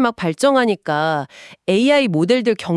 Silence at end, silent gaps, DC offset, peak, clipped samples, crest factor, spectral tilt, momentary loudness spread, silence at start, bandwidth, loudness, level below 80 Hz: 0 s; none; under 0.1%; -2 dBFS; under 0.1%; 14 dB; -5.5 dB/octave; 9 LU; 0 s; 12 kHz; -17 LUFS; -62 dBFS